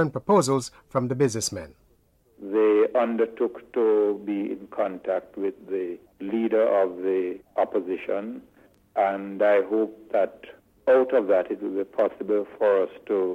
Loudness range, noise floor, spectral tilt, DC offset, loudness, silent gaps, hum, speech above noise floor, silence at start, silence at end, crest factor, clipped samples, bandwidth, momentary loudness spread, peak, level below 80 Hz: 3 LU; -62 dBFS; -5.5 dB/octave; under 0.1%; -25 LUFS; none; none; 38 dB; 0 s; 0 s; 16 dB; under 0.1%; 14 kHz; 10 LU; -8 dBFS; -64 dBFS